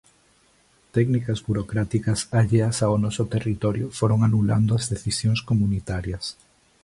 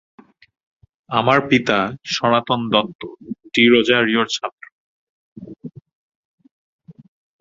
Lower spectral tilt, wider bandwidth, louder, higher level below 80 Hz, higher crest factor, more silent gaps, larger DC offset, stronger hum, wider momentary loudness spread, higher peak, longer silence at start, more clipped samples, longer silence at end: first, -6 dB/octave vs -4.5 dB/octave; first, 11.5 kHz vs 7.8 kHz; second, -23 LUFS vs -17 LUFS; first, -44 dBFS vs -58 dBFS; about the same, 16 dB vs 20 dB; second, none vs 2.95-2.99 s, 4.53-4.58 s, 4.72-5.36 s; neither; neither; second, 8 LU vs 23 LU; second, -8 dBFS vs -2 dBFS; second, 0.95 s vs 1.1 s; neither; second, 0.5 s vs 1.7 s